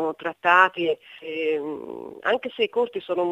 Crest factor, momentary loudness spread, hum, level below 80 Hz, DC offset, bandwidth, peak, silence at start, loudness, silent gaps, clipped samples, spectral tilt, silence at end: 22 dB; 16 LU; none; -72 dBFS; under 0.1%; 9.6 kHz; -2 dBFS; 0 s; -23 LUFS; none; under 0.1%; -5 dB/octave; 0 s